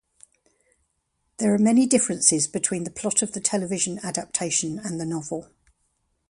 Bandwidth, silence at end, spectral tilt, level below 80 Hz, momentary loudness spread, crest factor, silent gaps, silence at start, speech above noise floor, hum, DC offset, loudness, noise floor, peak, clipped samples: 11.5 kHz; 0.85 s; -3.5 dB/octave; -64 dBFS; 11 LU; 24 dB; none; 1.4 s; 50 dB; none; under 0.1%; -23 LUFS; -74 dBFS; -2 dBFS; under 0.1%